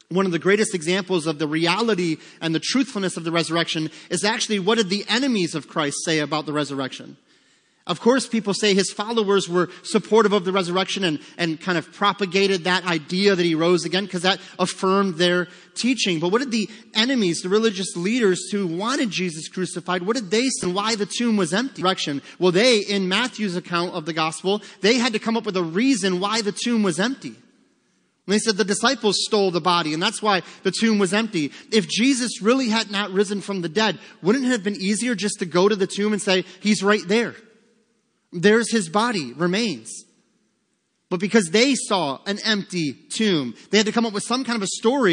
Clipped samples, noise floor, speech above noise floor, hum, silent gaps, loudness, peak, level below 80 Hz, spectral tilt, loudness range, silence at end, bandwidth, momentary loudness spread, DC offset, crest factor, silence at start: under 0.1%; -71 dBFS; 49 dB; none; none; -21 LUFS; -2 dBFS; -72 dBFS; -4 dB/octave; 2 LU; 0 s; 10.5 kHz; 7 LU; under 0.1%; 20 dB; 0.1 s